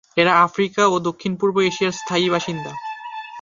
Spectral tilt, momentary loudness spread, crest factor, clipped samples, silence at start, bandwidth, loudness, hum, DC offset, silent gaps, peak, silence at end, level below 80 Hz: -4.5 dB/octave; 15 LU; 18 dB; under 0.1%; 0.15 s; 7.4 kHz; -19 LUFS; none; under 0.1%; none; -2 dBFS; 0 s; -62 dBFS